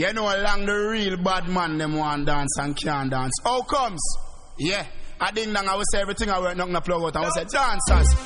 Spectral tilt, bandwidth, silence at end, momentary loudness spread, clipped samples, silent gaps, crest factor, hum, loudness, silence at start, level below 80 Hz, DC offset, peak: -4 dB/octave; 11 kHz; 0 s; 4 LU; under 0.1%; none; 18 dB; none; -24 LUFS; 0 s; -28 dBFS; under 0.1%; -6 dBFS